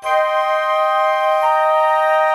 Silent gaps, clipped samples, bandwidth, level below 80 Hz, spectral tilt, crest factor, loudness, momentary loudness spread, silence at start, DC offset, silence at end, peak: none; under 0.1%; 13.5 kHz; -62 dBFS; 0.5 dB/octave; 12 dB; -15 LUFS; 2 LU; 0 s; under 0.1%; 0 s; -4 dBFS